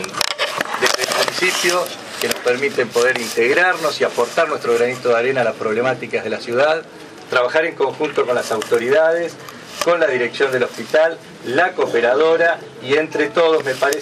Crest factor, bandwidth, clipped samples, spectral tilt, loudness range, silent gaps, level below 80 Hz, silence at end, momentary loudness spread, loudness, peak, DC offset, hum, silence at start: 18 dB; 15.5 kHz; under 0.1%; -3 dB/octave; 2 LU; none; -66 dBFS; 0 s; 7 LU; -17 LUFS; 0 dBFS; under 0.1%; none; 0 s